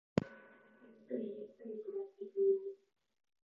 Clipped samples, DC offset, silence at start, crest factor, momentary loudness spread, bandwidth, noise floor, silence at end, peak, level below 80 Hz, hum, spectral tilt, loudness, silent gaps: under 0.1%; under 0.1%; 0.15 s; 26 dB; 17 LU; 7 kHz; -62 dBFS; 0.7 s; -14 dBFS; -72 dBFS; none; -7.5 dB/octave; -40 LUFS; none